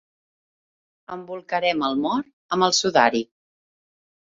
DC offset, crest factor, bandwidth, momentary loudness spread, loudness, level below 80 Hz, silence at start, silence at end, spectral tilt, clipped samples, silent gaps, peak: under 0.1%; 22 dB; 7.8 kHz; 18 LU; -21 LUFS; -66 dBFS; 1.1 s; 1.1 s; -3 dB/octave; under 0.1%; 2.33-2.49 s; -2 dBFS